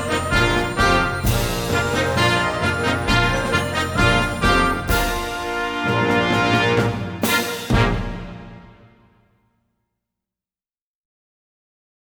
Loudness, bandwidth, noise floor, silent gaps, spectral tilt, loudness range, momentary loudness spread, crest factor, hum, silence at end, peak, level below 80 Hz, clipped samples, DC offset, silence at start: -19 LUFS; over 20 kHz; under -90 dBFS; none; -4.5 dB/octave; 6 LU; 6 LU; 18 dB; none; 3.5 s; -2 dBFS; -32 dBFS; under 0.1%; under 0.1%; 0 s